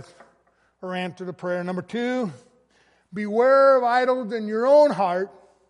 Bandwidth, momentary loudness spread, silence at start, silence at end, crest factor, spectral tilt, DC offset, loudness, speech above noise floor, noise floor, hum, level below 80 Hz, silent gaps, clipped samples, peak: 10.5 kHz; 16 LU; 0.8 s; 0.4 s; 16 dB; -6.5 dB/octave; under 0.1%; -21 LUFS; 43 dB; -64 dBFS; none; -76 dBFS; none; under 0.1%; -6 dBFS